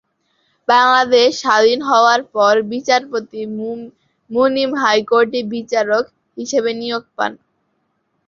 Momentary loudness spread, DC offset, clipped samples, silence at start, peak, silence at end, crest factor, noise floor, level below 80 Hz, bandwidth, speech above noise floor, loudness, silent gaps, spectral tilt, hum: 13 LU; under 0.1%; under 0.1%; 0.7 s; -2 dBFS; 0.95 s; 16 dB; -67 dBFS; -64 dBFS; 7.4 kHz; 52 dB; -15 LUFS; none; -3 dB/octave; none